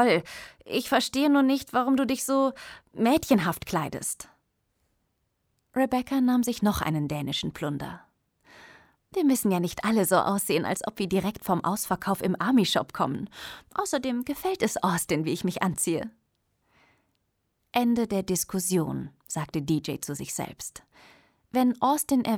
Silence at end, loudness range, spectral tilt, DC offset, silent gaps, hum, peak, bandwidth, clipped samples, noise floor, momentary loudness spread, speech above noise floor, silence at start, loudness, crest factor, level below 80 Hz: 0 s; 4 LU; -4.5 dB/octave; under 0.1%; none; none; -8 dBFS; over 20 kHz; under 0.1%; -76 dBFS; 12 LU; 49 dB; 0 s; -27 LUFS; 20 dB; -58 dBFS